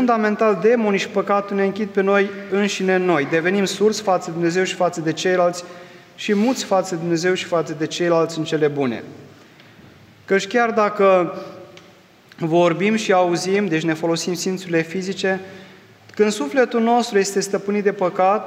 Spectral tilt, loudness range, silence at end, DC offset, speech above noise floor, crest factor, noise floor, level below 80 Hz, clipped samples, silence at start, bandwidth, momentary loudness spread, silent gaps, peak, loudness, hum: -5 dB/octave; 3 LU; 0 s; under 0.1%; 30 dB; 16 dB; -48 dBFS; -72 dBFS; under 0.1%; 0 s; 15.5 kHz; 7 LU; none; -4 dBFS; -19 LUFS; none